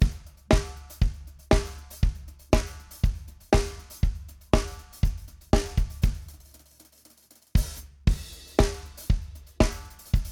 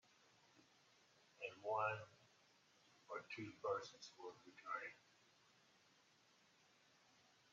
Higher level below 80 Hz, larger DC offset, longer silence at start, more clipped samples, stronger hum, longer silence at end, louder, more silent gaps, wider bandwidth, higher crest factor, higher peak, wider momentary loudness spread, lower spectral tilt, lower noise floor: first, -30 dBFS vs under -90 dBFS; neither; second, 0 s vs 0.55 s; neither; neither; second, 0 s vs 2.55 s; first, -28 LUFS vs -49 LUFS; neither; first, 17.5 kHz vs 7.4 kHz; about the same, 22 dB vs 24 dB; first, -4 dBFS vs -30 dBFS; about the same, 16 LU vs 15 LU; first, -6 dB/octave vs -2.5 dB/octave; second, -57 dBFS vs -75 dBFS